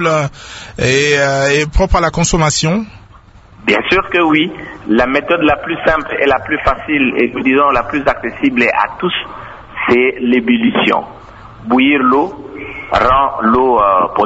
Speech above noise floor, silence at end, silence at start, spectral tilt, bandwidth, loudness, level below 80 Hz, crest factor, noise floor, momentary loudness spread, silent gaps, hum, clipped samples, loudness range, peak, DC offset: 28 dB; 0 s; 0 s; -4.5 dB/octave; 8 kHz; -13 LUFS; -30 dBFS; 14 dB; -40 dBFS; 10 LU; none; none; under 0.1%; 1 LU; 0 dBFS; under 0.1%